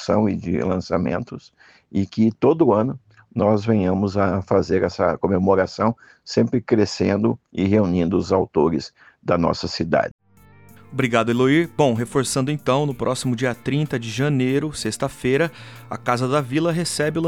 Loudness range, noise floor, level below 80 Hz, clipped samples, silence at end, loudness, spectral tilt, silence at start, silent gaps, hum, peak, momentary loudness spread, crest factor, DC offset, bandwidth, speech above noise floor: 2 LU; -50 dBFS; -50 dBFS; under 0.1%; 0 s; -21 LUFS; -6 dB/octave; 0 s; 10.11-10.19 s; none; -4 dBFS; 8 LU; 18 dB; under 0.1%; 15.5 kHz; 30 dB